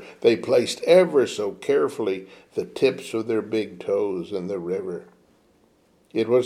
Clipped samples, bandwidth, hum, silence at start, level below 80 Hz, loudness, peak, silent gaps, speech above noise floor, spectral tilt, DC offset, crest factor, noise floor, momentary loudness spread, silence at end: under 0.1%; 15 kHz; none; 0 s; -70 dBFS; -23 LUFS; -4 dBFS; none; 38 dB; -5 dB/octave; under 0.1%; 18 dB; -60 dBFS; 14 LU; 0 s